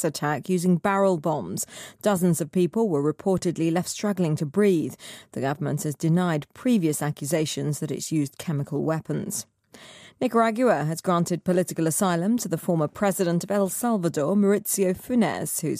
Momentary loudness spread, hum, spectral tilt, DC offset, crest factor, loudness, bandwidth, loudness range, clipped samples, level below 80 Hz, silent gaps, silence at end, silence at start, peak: 7 LU; none; -5.5 dB/octave; under 0.1%; 14 dB; -25 LUFS; 15.5 kHz; 3 LU; under 0.1%; -64 dBFS; none; 0 s; 0 s; -10 dBFS